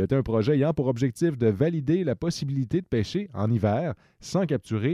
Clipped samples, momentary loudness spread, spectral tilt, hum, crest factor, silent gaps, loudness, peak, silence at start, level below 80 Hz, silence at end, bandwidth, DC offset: under 0.1%; 5 LU; -7.5 dB/octave; none; 16 dB; none; -26 LUFS; -10 dBFS; 0 s; -52 dBFS; 0 s; 13 kHz; under 0.1%